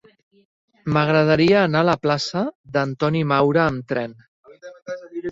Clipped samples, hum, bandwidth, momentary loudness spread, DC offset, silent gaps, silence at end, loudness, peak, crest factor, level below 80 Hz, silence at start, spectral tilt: under 0.1%; none; 7.8 kHz; 17 LU; under 0.1%; 2.55-2.64 s, 4.28-4.44 s; 0 s; -19 LUFS; -4 dBFS; 16 dB; -54 dBFS; 0.85 s; -6.5 dB/octave